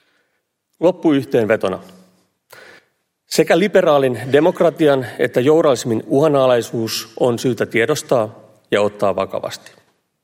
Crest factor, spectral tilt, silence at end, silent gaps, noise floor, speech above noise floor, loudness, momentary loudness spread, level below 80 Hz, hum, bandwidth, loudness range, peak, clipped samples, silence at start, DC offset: 16 dB; -5.5 dB/octave; 0.65 s; none; -70 dBFS; 54 dB; -16 LUFS; 9 LU; -62 dBFS; none; 16.5 kHz; 5 LU; 0 dBFS; under 0.1%; 0.8 s; under 0.1%